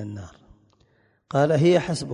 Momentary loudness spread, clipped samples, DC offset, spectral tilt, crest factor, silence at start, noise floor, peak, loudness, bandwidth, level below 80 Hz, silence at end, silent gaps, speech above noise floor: 18 LU; under 0.1%; under 0.1%; -6.5 dB/octave; 16 dB; 0 s; -63 dBFS; -8 dBFS; -21 LUFS; 11 kHz; -54 dBFS; 0 s; none; 41 dB